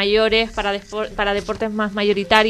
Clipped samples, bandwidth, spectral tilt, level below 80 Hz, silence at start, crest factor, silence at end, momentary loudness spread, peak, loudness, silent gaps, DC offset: under 0.1%; 13 kHz; -4.5 dB/octave; -40 dBFS; 0 s; 18 dB; 0 s; 9 LU; 0 dBFS; -20 LUFS; none; under 0.1%